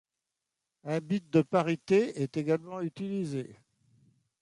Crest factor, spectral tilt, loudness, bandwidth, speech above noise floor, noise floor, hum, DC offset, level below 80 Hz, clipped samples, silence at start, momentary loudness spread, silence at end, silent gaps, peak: 20 dB; -7.5 dB/octave; -30 LUFS; 11.5 kHz; 58 dB; -87 dBFS; none; under 0.1%; -74 dBFS; under 0.1%; 0.85 s; 11 LU; 0.85 s; none; -12 dBFS